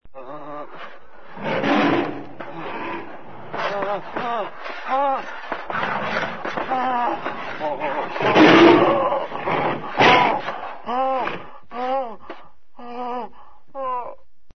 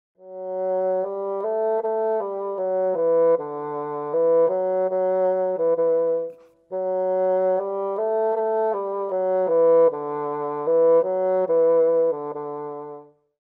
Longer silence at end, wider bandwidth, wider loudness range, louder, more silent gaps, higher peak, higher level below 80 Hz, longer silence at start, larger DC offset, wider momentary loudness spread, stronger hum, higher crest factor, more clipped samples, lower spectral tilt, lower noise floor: second, 0 s vs 0.4 s; first, 6.4 kHz vs 2.5 kHz; first, 11 LU vs 3 LU; about the same, -20 LUFS vs -22 LUFS; neither; first, 0 dBFS vs -10 dBFS; first, -56 dBFS vs -78 dBFS; second, 0 s vs 0.2 s; first, 2% vs under 0.1%; first, 22 LU vs 11 LU; neither; first, 22 dB vs 12 dB; neither; second, -5.5 dB/octave vs -10 dB/octave; first, -47 dBFS vs -42 dBFS